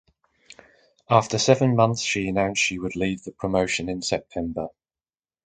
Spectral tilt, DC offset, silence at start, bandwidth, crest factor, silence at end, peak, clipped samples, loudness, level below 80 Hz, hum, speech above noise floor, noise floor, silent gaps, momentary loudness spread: -4.5 dB/octave; under 0.1%; 1.1 s; 9.4 kHz; 22 dB; 0.75 s; -2 dBFS; under 0.1%; -23 LUFS; -50 dBFS; none; over 67 dB; under -90 dBFS; none; 11 LU